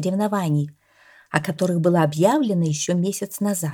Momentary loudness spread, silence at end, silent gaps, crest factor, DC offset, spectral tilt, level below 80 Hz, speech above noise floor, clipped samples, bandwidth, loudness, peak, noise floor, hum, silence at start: 7 LU; 0 s; none; 20 dB; under 0.1%; -6 dB/octave; -66 dBFS; 33 dB; under 0.1%; 18.5 kHz; -21 LUFS; 0 dBFS; -53 dBFS; none; 0 s